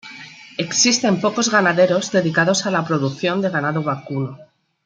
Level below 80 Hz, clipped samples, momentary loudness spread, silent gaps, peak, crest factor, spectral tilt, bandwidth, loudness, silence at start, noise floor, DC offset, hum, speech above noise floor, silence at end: -66 dBFS; under 0.1%; 12 LU; none; -2 dBFS; 18 dB; -3.5 dB/octave; 10 kHz; -18 LUFS; 0.05 s; -39 dBFS; under 0.1%; none; 21 dB; 0.4 s